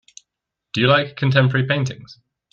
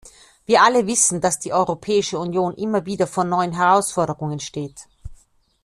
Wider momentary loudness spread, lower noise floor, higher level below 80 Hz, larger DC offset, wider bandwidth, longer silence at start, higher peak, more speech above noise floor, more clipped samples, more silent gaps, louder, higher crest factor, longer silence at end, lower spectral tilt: second, 11 LU vs 14 LU; first, -82 dBFS vs -56 dBFS; second, -58 dBFS vs -52 dBFS; neither; second, 7.4 kHz vs 13.5 kHz; first, 0.75 s vs 0.05 s; about the same, -2 dBFS vs -2 dBFS; first, 64 dB vs 36 dB; neither; neither; about the same, -18 LUFS vs -19 LUFS; about the same, 18 dB vs 18 dB; about the same, 0.4 s vs 0.5 s; first, -6 dB/octave vs -3.5 dB/octave